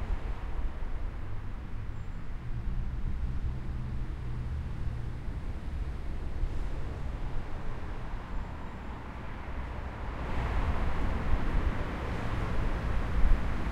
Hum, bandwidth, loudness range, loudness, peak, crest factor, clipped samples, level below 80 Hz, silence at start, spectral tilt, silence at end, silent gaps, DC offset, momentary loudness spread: none; 7.2 kHz; 6 LU; -37 LUFS; -12 dBFS; 20 dB; under 0.1%; -34 dBFS; 0 s; -7.5 dB/octave; 0 s; none; under 0.1%; 9 LU